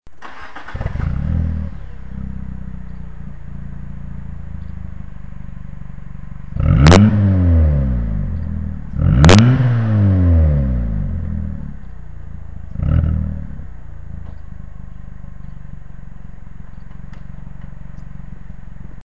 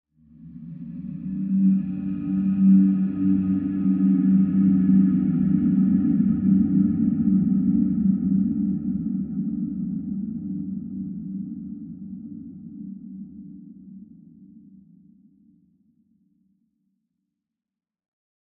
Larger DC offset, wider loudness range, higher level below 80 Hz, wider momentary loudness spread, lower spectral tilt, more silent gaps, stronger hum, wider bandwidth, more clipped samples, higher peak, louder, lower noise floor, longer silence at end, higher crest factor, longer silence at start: first, 3% vs under 0.1%; first, 23 LU vs 19 LU; first, -24 dBFS vs -54 dBFS; first, 25 LU vs 20 LU; second, -7 dB/octave vs -13.5 dB/octave; neither; neither; first, 8 kHz vs 2.6 kHz; neither; first, 0 dBFS vs -8 dBFS; first, -15 LUFS vs -22 LUFS; second, -36 dBFS vs -88 dBFS; second, 0 s vs 4 s; about the same, 18 dB vs 16 dB; second, 0 s vs 0.4 s